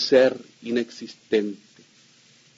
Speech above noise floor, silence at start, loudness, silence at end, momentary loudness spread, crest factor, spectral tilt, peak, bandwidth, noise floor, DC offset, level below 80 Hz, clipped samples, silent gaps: 33 dB; 0 s; -24 LUFS; 1 s; 20 LU; 20 dB; -4.5 dB/octave; -6 dBFS; 7.8 kHz; -56 dBFS; under 0.1%; -72 dBFS; under 0.1%; none